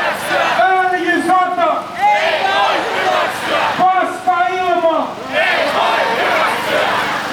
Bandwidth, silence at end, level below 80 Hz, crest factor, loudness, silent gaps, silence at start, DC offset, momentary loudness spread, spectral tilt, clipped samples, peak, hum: over 20 kHz; 0 s; -58 dBFS; 12 dB; -14 LUFS; none; 0 s; under 0.1%; 3 LU; -3 dB/octave; under 0.1%; -2 dBFS; none